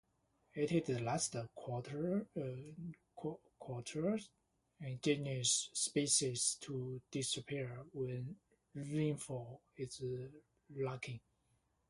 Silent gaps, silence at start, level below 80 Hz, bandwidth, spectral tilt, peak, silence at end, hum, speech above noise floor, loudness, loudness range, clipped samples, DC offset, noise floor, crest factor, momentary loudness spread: none; 0.55 s; -74 dBFS; 11.5 kHz; -4 dB/octave; -20 dBFS; 0.7 s; none; 39 dB; -40 LUFS; 7 LU; under 0.1%; under 0.1%; -79 dBFS; 22 dB; 17 LU